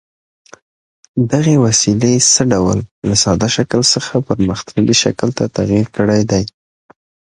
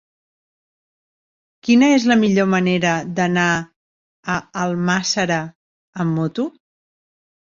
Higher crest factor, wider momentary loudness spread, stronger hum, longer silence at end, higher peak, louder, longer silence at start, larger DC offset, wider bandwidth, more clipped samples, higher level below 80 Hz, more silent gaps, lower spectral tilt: about the same, 14 dB vs 18 dB; second, 7 LU vs 13 LU; neither; second, 0.8 s vs 1.1 s; about the same, 0 dBFS vs -2 dBFS; first, -13 LUFS vs -18 LUFS; second, 1.15 s vs 1.65 s; neither; first, 11 kHz vs 7.6 kHz; neither; first, -40 dBFS vs -58 dBFS; second, 2.91-3.02 s vs 3.76-4.23 s, 5.55-5.93 s; about the same, -4 dB/octave vs -5 dB/octave